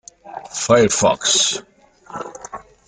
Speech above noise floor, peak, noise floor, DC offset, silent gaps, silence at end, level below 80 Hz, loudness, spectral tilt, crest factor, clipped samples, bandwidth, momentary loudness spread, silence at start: 21 dB; -2 dBFS; -37 dBFS; under 0.1%; none; 0.25 s; -52 dBFS; -16 LUFS; -2.5 dB/octave; 18 dB; under 0.1%; 10 kHz; 21 LU; 0.25 s